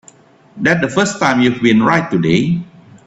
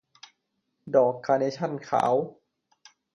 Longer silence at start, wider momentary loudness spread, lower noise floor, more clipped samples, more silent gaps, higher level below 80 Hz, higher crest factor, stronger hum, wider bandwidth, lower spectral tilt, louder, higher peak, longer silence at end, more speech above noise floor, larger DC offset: second, 0.55 s vs 0.85 s; about the same, 6 LU vs 7 LU; second, -45 dBFS vs -78 dBFS; neither; neither; first, -50 dBFS vs -74 dBFS; second, 14 dB vs 20 dB; neither; second, 8.2 kHz vs 11 kHz; about the same, -5.5 dB/octave vs -6.5 dB/octave; first, -14 LUFS vs -25 LUFS; first, 0 dBFS vs -8 dBFS; second, 0.4 s vs 0.85 s; second, 32 dB vs 53 dB; neither